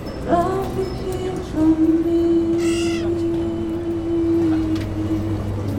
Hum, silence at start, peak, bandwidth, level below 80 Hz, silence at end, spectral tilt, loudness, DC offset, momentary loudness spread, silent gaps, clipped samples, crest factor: none; 0 s; -4 dBFS; 13.5 kHz; -36 dBFS; 0 s; -7 dB/octave; -20 LUFS; under 0.1%; 8 LU; none; under 0.1%; 16 dB